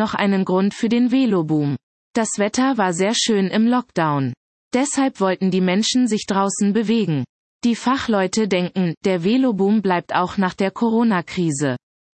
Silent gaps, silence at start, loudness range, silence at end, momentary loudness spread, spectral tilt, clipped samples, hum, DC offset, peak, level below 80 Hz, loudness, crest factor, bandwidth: 1.83-2.14 s, 4.37-4.71 s, 7.29-7.60 s, 8.97-9.01 s; 0 s; 1 LU; 0.4 s; 6 LU; -5 dB/octave; under 0.1%; none; under 0.1%; -4 dBFS; -60 dBFS; -19 LUFS; 16 dB; 8.8 kHz